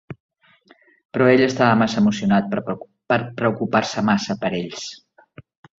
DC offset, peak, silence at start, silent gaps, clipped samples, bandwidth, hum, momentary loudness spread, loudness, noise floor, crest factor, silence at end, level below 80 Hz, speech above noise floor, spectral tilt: under 0.1%; -2 dBFS; 0.1 s; 0.20-0.29 s, 1.05-1.09 s; under 0.1%; 7.8 kHz; none; 16 LU; -20 LUFS; -55 dBFS; 18 dB; 0.85 s; -56 dBFS; 36 dB; -6 dB/octave